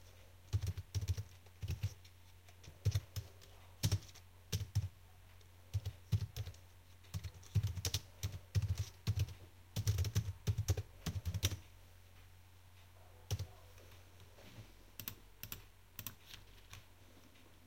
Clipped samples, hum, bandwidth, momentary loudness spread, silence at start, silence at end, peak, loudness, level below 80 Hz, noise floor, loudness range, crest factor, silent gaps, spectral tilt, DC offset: under 0.1%; none; 16.5 kHz; 23 LU; 0 s; 0.05 s; -18 dBFS; -43 LUFS; -56 dBFS; -63 dBFS; 12 LU; 26 dB; none; -4.5 dB/octave; under 0.1%